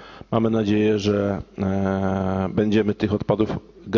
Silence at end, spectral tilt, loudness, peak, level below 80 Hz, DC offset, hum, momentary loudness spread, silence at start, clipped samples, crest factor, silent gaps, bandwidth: 0 s; -7.5 dB/octave; -22 LUFS; -4 dBFS; -44 dBFS; under 0.1%; none; 6 LU; 0 s; under 0.1%; 18 dB; none; 7.2 kHz